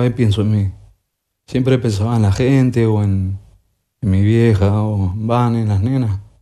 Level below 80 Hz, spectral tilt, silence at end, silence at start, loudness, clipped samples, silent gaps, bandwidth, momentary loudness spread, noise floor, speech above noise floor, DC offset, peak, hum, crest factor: -42 dBFS; -8 dB/octave; 0.2 s; 0 s; -16 LUFS; under 0.1%; none; 11.5 kHz; 9 LU; -72 dBFS; 57 dB; under 0.1%; -2 dBFS; none; 14 dB